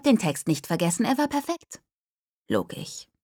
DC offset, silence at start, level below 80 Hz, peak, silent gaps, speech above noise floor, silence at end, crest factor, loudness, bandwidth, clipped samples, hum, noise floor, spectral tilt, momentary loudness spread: under 0.1%; 0.05 s; -64 dBFS; -6 dBFS; 1.94-2.45 s; over 65 dB; 0.2 s; 20 dB; -26 LUFS; over 20 kHz; under 0.1%; none; under -90 dBFS; -5 dB/octave; 14 LU